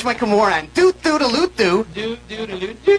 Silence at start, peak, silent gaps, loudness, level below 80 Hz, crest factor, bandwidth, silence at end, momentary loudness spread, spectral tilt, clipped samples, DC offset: 0 s; -2 dBFS; none; -18 LUFS; -46 dBFS; 16 dB; 11 kHz; 0 s; 11 LU; -4.5 dB/octave; under 0.1%; under 0.1%